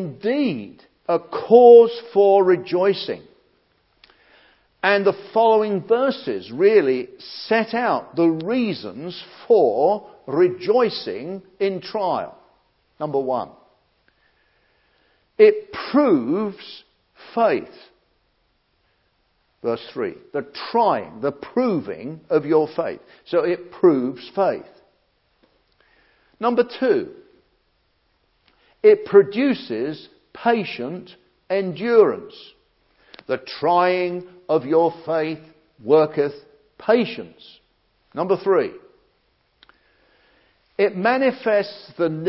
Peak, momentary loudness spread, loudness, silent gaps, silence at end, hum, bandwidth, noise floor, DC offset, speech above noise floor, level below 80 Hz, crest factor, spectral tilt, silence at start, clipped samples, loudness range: 0 dBFS; 16 LU; -20 LUFS; none; 0 s; none; 5.8 kHz; -66 dBFS; under 0.1%; 47 dB; -68 dBFS; 20 dB; -10.5 dB/octave; 0 s; under 0.1%; 8 LU